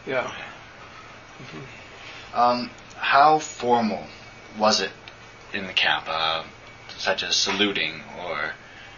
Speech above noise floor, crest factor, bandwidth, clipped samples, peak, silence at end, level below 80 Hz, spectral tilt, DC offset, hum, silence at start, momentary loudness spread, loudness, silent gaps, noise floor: 21 dB; 22 dB; 7.4 kHz; under 0.1%; -4 dBFS; 0 s; -58 dBFS; -2.5 dB/octave; under 0.1%; none; 0 s; 22 LU; -23 LUFS; none; -44 dBFS